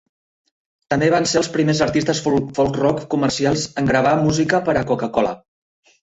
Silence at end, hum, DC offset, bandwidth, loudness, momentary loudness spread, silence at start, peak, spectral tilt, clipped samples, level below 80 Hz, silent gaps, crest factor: 0.65 s; none; under 0.1%; 8.2 kHz; -18 LUFS; 4 LU; 0.9 s; -2 dBFS; -5 dB/octave; under 0.1%; -46 dBFS; none; 16 dB